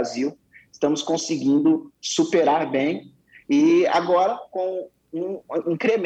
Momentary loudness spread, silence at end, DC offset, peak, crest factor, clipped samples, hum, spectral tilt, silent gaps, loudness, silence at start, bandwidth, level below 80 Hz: 11 LU; 0 s; under 0.1%; -10 dBFS; 12 dB; under 0.1%; none; -4.5 dB/octave; none; -22 LUFS; 0 s; 8.6 kHz; -68 dBFS